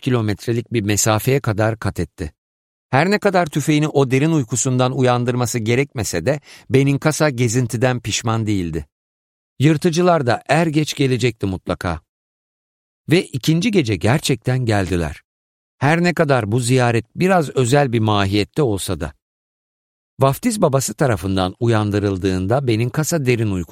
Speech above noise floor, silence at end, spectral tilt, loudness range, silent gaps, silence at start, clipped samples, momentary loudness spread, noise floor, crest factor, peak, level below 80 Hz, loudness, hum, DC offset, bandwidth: over 73 dB; 0.05 s; -5.5 dB/octave; 3 LU; 2.38-2.89 s, 8.92-9.56 s, 12.09-13.04 s, 15.25-15.78 s, 19.22-20.17 s; 0 s; under 0.1%; 7 LU; under -90 dBFS; 16 dB; -2 dBFS; -44 dBFS; -18 LUFS; none; under 0.1%; 16.5 kHz